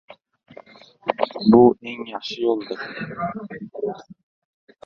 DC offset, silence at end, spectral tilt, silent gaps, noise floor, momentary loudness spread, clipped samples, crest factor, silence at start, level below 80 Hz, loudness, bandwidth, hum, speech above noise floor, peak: under 0.1%; 0.7 s; -7.5 dB/octave; none; -46 dBFS; 17 LU; under 0.1%; 22 dB; 1.05 s; -58 dBFS; -21 LUFS; 6.8 kHz; none; 26 dB; -2 dBFS